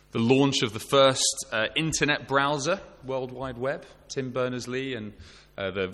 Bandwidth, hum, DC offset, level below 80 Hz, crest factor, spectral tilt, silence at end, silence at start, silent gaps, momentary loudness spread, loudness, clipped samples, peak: 14 kHz; none; under 0.1%; -56 dBFS; 20 dB; -3.5 dB/octave; 0 s; 0.15 s; none; 14 LU; -26 LUFS; under 0.1%; -8 dBFS